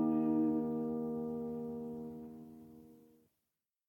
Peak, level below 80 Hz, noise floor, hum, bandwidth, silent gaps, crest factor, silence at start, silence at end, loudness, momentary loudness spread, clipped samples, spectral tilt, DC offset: -24 dBFS; -72 dBFS; -89 dBFS; none; 16.5 kHz; none; 14 dB; 0 s; 0.9 s; -37 LUFS; 23 LU; under 0.1%; -10.5 dB/octave; under 0.1%